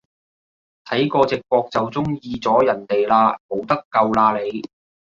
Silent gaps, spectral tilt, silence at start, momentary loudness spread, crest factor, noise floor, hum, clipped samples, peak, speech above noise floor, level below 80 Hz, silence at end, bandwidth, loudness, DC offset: 3.40-3.49 s, 3.85-3.91 s; -7 dB/octave; 0.85 s; 9 LU; 18 dB; under -90 dBFS; none; under 0.1%; -2 dBFS; over 71 dB; -56 dBFS; 0.4 s; 7.4 kHz; -19 LUFS; under 0.1%